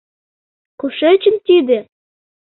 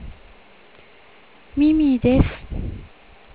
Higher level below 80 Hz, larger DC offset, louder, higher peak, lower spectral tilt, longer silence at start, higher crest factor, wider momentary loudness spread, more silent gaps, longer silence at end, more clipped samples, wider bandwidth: second, -64 dBFS vs -32 dBFS; second, under 0.1% vs 0.3%; first, -14 LUFS vs -20 LUFS; about the same, -2 dBFS vs -4 dBFS; second, -9 dB/octave vs -12 dB/octave; first, 0.85 s vs 0 s; second, 14 dB vs 20 dB; second, 11 LU vs 20 LU; neither; about the same, 0.6 s vs 0.5 s; neither; about the same, 4.2 kHz vs 4 kHz